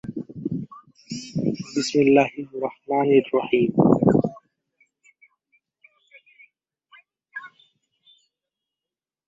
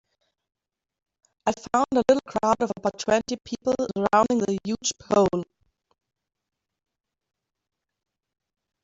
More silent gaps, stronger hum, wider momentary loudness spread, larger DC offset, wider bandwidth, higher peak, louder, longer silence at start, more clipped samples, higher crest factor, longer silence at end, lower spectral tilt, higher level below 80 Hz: neither; neither; first, 20 LU vs 8 LU; neither; about the same, 8.2 kHz vs 8.2 kHz; first, -2 dBFS vs -6 dBFS; about the same, -22 LUFS vs -24 LUFS; second, 0.05 s vs 1.45 s; neither; about the same, 22 dB vs 20 dB; second, 1.8 s vs 3.4 s; first, -6.5 dB/octave vs -4.5 dB/octave; about the same, -60 dBFS vs -58 dBFS